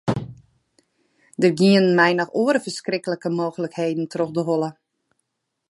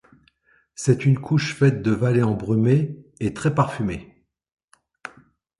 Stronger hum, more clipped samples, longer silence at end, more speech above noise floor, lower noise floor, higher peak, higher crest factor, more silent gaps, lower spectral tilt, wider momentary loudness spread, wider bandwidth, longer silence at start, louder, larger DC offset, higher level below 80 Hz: neither; neither; first, 1 s vs 0.5 s; first, 56 dB vs 41 dB; first, -76 dBFS vs -61 dBFS; about the same, -4 dBFS vs -4 dBFS; about the same, 18 dB vs 18 dB; second, none vs 4.53-4.57 s, 4.64-4.68 s; about the same, -6 dB/octave vs -7 dB/octave; second, 11 LU vs 21 LU; about the same, 11.5 kHz vs 11.5 kHz; second, 0.05 s vs 0.8 s; about the same, -21 LUFS vs -21 LUFS; neither; second, -60 dBFS vs -50 dBFS